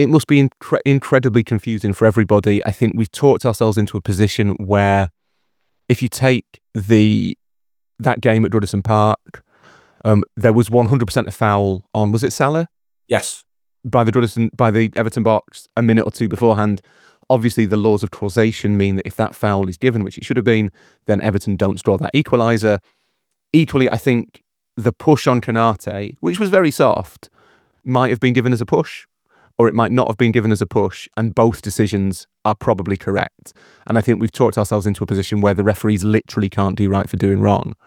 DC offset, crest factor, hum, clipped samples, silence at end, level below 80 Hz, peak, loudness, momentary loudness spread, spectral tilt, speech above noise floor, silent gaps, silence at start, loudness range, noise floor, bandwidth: under 0.1%; 16 dB; none; under 0.1%; 0.1 s; -50 dBFS; 0 dBFS; -17 LUFS; 7 LU; -7 dB/octave; 69 dB; none; 0 s; 2 LU; -85 dBFS; 16 kHz